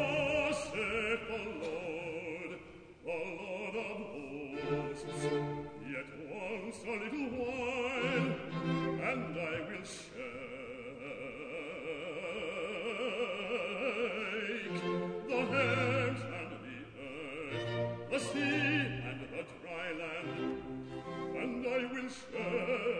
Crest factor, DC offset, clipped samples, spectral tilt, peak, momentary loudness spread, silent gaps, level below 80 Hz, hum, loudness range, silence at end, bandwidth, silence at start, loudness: 20 dB; under 0.1%; under 0.1%; -5.5 dB/octave; -18 dBFS; 12 LU; none; -64 dBFS; none; 6 LU; 0 s; 10 kHz; 0 s; -37 LUFS